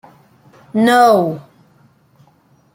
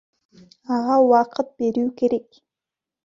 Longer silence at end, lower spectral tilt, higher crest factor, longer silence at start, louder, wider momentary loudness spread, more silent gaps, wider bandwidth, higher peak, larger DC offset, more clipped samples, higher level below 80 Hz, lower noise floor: first, 1.35 s vs 0.85 s; about the same, -5.5 dB/octave vs -6.5 dB/octave; about the same, 16 dB vs 18 dB; about the same, 0.75 s vs 0.7 s; first, -13 LUFS vs -20 LUFS; first, 14 LU vs 10 LU; neither; first, 16.5 kHz vs 7.4 kHz; first, 0 dBFS vs -4 dBFS; neither; neither; about the same, -64 dBFS vs -66 dBFS; second, -54 dBFS vs -88 dBFS